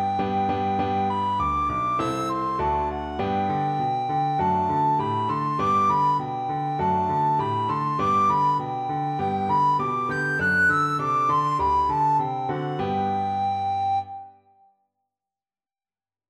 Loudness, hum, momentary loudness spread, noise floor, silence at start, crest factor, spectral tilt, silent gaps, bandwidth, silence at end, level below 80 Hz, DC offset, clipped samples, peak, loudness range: -23 LUFS; none; 7 LU; under -90 dBFS; 0 s; 12 dB; -6.5 dB/octave; none; 12.5 kHz; 2 s; -48 dBFS; under 0.1%; under 0.1%; -12 dBFS; 4 LU